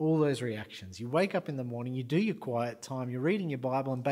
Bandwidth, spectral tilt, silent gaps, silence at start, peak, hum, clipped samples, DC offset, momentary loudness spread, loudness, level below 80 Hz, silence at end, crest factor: 15.5 kHz; -7 dB/octave; none; 0 s; -14 dBFS; none; under 0.1%; under 0.1%; 8 LU; -32 LUFS; -74 dBFS; 0 s; 16 dB